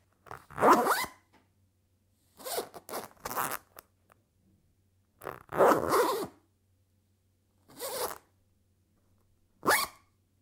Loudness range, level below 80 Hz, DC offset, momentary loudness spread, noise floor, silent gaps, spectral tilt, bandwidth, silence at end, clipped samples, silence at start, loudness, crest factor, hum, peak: 9 LU; -68 dBFS; under 0.1%; 21 LU; -72 dBFS; none; -3 dB/octave; 18 kHz; 0.5 s; under 0.1%; 0.3 s; -29 LUFS; 24 dB; none; -10 dBFS